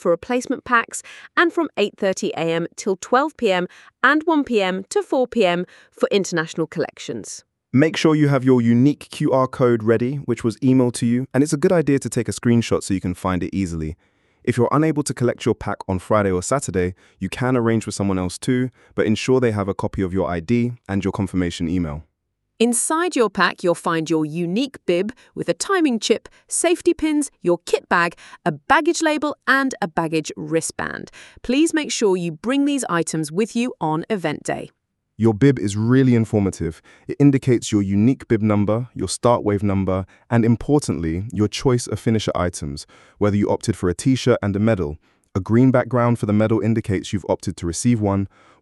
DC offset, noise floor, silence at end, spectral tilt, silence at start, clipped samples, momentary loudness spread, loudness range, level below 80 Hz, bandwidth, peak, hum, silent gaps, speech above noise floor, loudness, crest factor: under 0.1%; -74 dBFS; 0.35 s; -5.5 dB/octave; 0.05 s; under 0.1%; 9 LU; 3 LU; -48 dBFS; 12 kHz; 0 dBFS; none; none; 55 dB; -20 LUFS; 20 dB